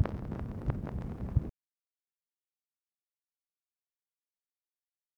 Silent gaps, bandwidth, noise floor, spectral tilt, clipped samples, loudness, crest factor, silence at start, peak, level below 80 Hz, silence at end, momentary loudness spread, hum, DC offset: none; 6.8 kHz; under -90 dBFS; -10 dB/octave; under 0.1%; -37 LUFS; 26 dB; 0 s; -14 dBFS; -46 dBFS; 3.65 s; 6 LU; none; under 0.1%